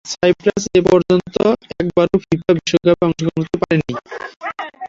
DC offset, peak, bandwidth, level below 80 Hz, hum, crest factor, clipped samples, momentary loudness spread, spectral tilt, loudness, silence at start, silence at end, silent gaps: under 0.1%; -2 dBFS; 7.8 kHz; -46 dBFS; none; 16 dB; under 0.1%; 13 LU; -6 dB/octave; -16 LUFS; 0.05 s; 0 s; 4.36-4.40 s